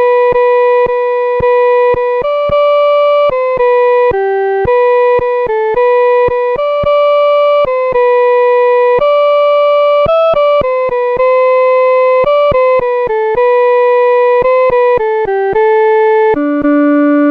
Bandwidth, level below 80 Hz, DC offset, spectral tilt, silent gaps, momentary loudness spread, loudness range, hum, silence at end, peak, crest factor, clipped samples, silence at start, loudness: 5.2 kHz; -38 dBFS; under 0.1%; -7 dB/octave; none; 4 LU; 1 LU; none; 0 s; -2 dBFS; 6 dB; under 0.1%; 0 s; -10 LUFS